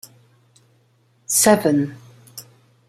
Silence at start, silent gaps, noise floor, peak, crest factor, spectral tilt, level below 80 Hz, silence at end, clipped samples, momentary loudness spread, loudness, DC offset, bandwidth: 1.3 s; none; -60 dBFS; -2 dBFS; 20 dB; -3.5 dB/octave; -62 dBFS; 0.45 s; under 0.1%; 25 LU; -17 LUFS; under 0.1%; 16 kHz